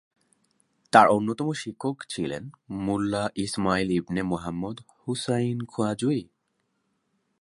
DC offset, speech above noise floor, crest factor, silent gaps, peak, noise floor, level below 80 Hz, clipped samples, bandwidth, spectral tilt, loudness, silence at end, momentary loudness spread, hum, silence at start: under 0.1%; 50 dB; 26 dB; none; -2 dBFS; -75 dBFS; -56 dBFS; under 0.1%; 11.5 kHz; -5.5 dB/octave; -26 LUFS; 1.15 s; 13 LU; none; 0.95 s